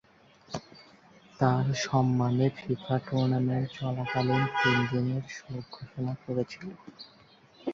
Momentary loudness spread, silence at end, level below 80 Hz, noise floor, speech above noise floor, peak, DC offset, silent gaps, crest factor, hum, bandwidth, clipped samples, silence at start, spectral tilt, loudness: 17 LU; 0 s; -62 dBFS; -58 dBFS; 29 dB; -12 dBFS; under 0.1%; none; 18 dB; none; 7.4 kHz; under 0.1%; 0.5 s; -6.5 dB/octave; -29 LUFS